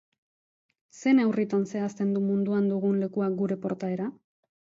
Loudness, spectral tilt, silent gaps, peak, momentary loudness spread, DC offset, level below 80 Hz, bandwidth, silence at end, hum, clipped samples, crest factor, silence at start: -27 LUFS; -8 dB/octave; none; -12 dBFS; 8 LU; under 0.1%; -74 dBFS; 7.6 kHz; 0.6 s; none; under 0.1%; 16 dB; 0.95 s